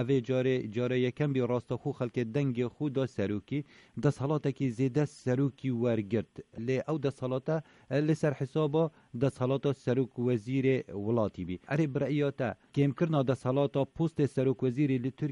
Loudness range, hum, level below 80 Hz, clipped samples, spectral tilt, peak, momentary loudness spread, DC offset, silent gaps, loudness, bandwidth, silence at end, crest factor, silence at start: 2 LU; none; -64 dBFS; under 0.1%; -8 dB/octave; -14 dBFS; 5 LU; under 0.1%; none; -31 LUFS; 11 kHz; 0 s; 16 dB; 0 s